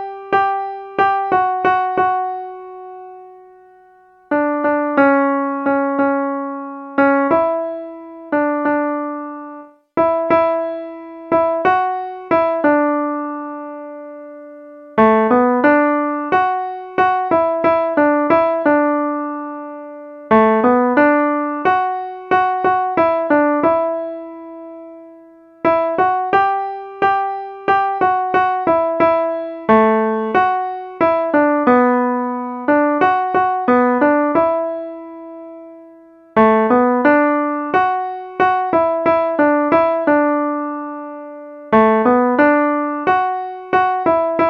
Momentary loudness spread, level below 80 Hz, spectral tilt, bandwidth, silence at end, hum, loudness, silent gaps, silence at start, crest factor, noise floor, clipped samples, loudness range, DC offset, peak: 17 LU; -56 dBFS; -8 dB/octave; 5.8 kHz; 0 s; none; -16 LUFS; none; 0 s; 16 dB; -48 dBFS; under 0.1%; 4 LU; under 0.1%; 0 dBFS